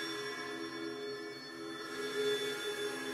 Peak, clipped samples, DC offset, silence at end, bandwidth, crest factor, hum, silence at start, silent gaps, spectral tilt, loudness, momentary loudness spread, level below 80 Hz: -24 dBFS; under 0.1%; under 0.1%; 0 s; 16 kHz; 16 dB; none; 0 s; none; -2.5 dB/octave; -39 LUFS; 9 LU; -80 dBFS